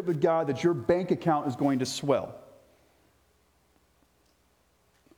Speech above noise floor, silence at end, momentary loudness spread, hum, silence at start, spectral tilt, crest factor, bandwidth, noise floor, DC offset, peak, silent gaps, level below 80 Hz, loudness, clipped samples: 41 dB; 2.75 s; 4 LU; 60 Hz at -65 dBFS; 0 s; -6 dB/octave; 20 dB; 16 kHz; -68 dBFS; under 0.1%; -10 dBFS; none; -64 dBFS; -27 LUFS; under 0.1%